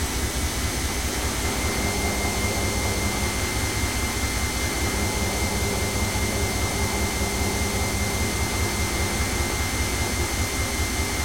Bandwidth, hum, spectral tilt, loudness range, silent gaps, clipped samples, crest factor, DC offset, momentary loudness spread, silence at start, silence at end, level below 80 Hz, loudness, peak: 16.5 kHz; none; -3.5 dB/octave; 0 LU; none; under 0.1%; 14 dB; under 0.1%; 1 LU; 0 s; 0 s; -32 dBFS; -24 LUFS; -10 dBFS